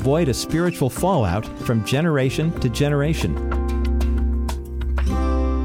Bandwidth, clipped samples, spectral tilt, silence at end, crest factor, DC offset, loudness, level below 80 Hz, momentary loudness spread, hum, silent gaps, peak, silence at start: 16 kHz; under 0.1%; -6.5 dB/octave; 0 s; 14 dB; under 0.1%; -21 LUFS; -24 dBFS; 5 LU; none; none; -6 dBFS; 0 s